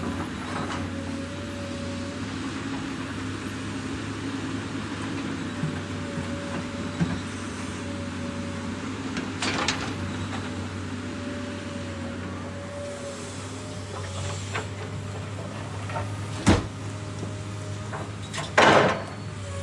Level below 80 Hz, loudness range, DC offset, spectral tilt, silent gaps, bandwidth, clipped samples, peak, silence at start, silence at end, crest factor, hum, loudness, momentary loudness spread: -50 dBFS; 8 LU; under 0.1%; -5 dB/octave; none; 11.5 kHz; under 0.1%; -4 dBFS; 0 s; 0 s; 24 dB; none; -29 LUFS; 10 LU